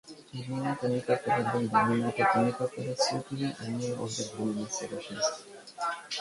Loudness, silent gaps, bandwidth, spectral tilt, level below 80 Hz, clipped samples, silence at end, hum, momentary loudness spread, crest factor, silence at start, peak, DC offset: -30 LUFS; none; 11.5 kHz; -4.5 dB/octave; -68 dBFS; under 0.1%; 0 s; none; 10 LU; 20 dB; 0.05 s; -12 dBFS; under 0.1%